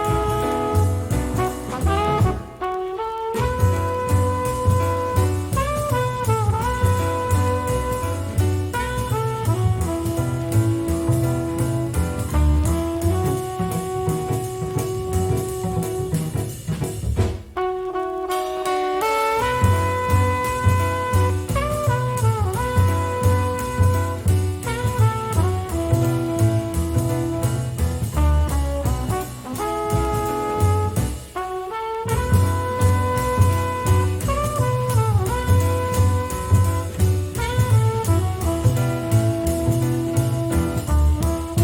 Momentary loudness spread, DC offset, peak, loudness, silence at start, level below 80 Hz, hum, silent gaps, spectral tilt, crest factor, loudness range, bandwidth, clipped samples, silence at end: 6 LU; under 0.1%; -4 dBFS; -21 LUFS; 0 s; -32 dBFS; none; none; -6.5 dB/octave; 16 dB; 3 LU; 17.5 kHz; under 0.1%; 0 s